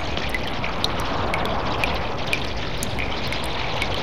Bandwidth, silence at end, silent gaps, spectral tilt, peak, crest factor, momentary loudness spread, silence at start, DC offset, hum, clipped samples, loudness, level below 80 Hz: 16.5 kHz; 0 s; none; -4 dB/octave; -4 dBFS; 22 dB; 3 LU; 0 s; 4%; none; under 0.1%; -25 LUFS; -34 dBFS